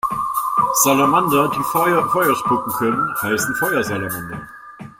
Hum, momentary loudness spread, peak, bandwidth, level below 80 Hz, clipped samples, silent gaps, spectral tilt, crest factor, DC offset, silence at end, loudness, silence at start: none; 12 LU; 0 dBFS; 16.5 kHz; -52 dBFS; under 0.1%; none; -4 dB/octave; 18 dB; under 0.1%; 0.1 s; -18 LUFS; 0.05 s